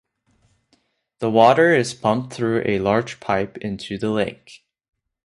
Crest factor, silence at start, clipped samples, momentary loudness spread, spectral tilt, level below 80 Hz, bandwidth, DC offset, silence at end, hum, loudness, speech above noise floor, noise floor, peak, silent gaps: 20 dB; 1.2 s; under 0.1%; 13 LU; -5.5 dB/octave; -54 dBFS; 11.5 kHz; under 0.1%; 0.9 s; none; -20 LUFS; 46 dB; -65 dBFS; -2 dBFS; none